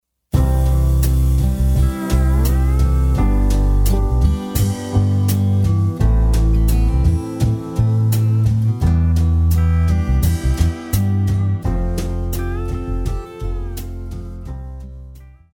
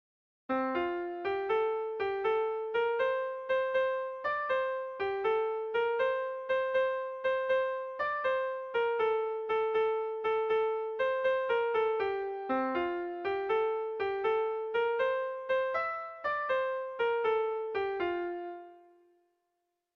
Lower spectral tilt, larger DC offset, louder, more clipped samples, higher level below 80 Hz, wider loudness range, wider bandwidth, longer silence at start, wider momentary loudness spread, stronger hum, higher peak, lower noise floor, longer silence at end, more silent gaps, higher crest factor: first, -7 dB/octave vs -5.5 dB/octave; neither; first, -18 LUFS vs -32 LUFS; neither; first, -18 dBFS vs -70 dBFS; first, 6 LU vs 1 LU; first, 18.5 kHz vs 5.8 kHz; second, 0.35 s vs 0.5 s; first, 11 LU vs 5 LU; neither; first, -2 dBFS vs -20 dBFS; second, -38 dBFS vs -83 dBFS; second, 0.25 s vs 1.15 s; neither; about the same, 14 dB vs 12 dB